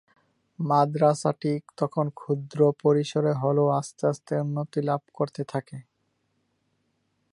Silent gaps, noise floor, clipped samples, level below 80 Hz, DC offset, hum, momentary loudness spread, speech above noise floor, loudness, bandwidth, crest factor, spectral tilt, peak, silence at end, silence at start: none; -74 dBFS; under 0.1%; -74 dBFS; under 0.1%; none; 10 LU; 49 dB; -26 LUFS; 11.5 kHz; 18 dB; -7.5 dB/octave; -8 dBFS; 1.5 s; 0.6 s